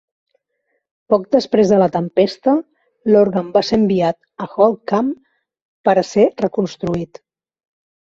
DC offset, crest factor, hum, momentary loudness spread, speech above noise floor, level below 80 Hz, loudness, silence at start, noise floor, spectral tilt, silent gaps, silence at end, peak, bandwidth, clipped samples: under 0.1%; 16 dB; none; 10 LU; 55 dB; -54 dBFS; -16 LUFS; 1.1 s; -70 dBFS; -7 dB/octave; 5.62-5.84 s; 0.95 s; -2 dBFS; 7.6 kHz; under 0.1%